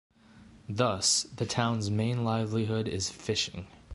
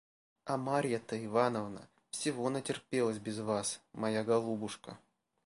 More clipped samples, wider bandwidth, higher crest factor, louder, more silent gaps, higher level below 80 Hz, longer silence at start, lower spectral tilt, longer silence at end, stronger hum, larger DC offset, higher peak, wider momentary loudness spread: neither; about the same, 11.5 kHz vs 11.5 kHz; about the same, 20 dB vs 20 dB; first, -29 LUFS vs -35 LUFS; neither; first, -54 dBFS vs -76 dBFS; about the same, 0.35 s vs 0.45 s; about the same, -4 dB/octave vs -4.5 dB/octave; second, 0 s vs 0.5 s; neither; neither; first, -10 dBFS vs -16 dBFS; second, 9 LU vs 13 LU